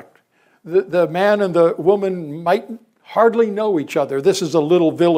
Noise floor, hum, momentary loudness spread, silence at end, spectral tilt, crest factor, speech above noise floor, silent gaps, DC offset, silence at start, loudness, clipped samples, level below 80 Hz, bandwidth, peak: -57 dBFS; none; 8 LU; 0 s; -6 dB/octave; 14 dB; 41 dB; none; under 0.1%; 0.65 s; -17 LUFS; under 0.1%; -68 dBFS; 16 kHz; -2 dBFS